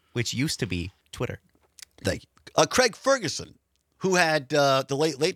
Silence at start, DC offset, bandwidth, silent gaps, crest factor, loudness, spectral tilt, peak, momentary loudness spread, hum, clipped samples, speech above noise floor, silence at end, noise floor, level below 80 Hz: 0.15 s; under 0.1%; 16.5 kHz; none; 20 dB; -25 LUFS; -3.5 dB/octave; -6 dBFS; 13 LU; none; under 0.1%; 27 dB; 0 s; -52 dBFS; -58 dBFS